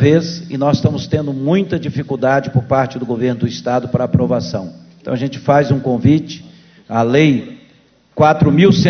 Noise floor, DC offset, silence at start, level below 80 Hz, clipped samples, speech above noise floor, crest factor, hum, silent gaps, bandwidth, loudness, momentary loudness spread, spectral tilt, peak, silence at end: -51 dBFS; under 0.1%; 0 s; -42 dBFS; under 0.1%; 37 dB; 14 dB; none; none; 6.6 kHz; -15 LUFS; 12 LU; -7.5 dB/octave; 0 dBFS; 0 s